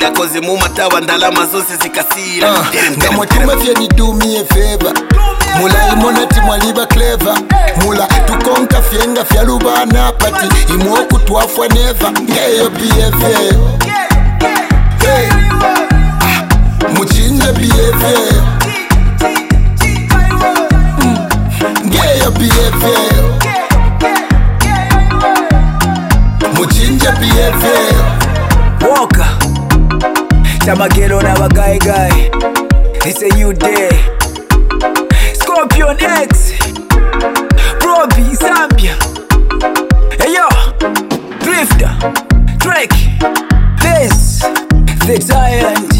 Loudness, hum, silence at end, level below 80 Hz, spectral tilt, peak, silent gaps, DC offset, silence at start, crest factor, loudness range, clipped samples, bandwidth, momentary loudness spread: -10 LUFS; none; 0 s; -12 dBFS; -4.5 dB/octave; 0 dBFS; none; under 0.1%; 0 s; 8 dB; 1 LU; under 0.1%; 17 kHz; 4 LU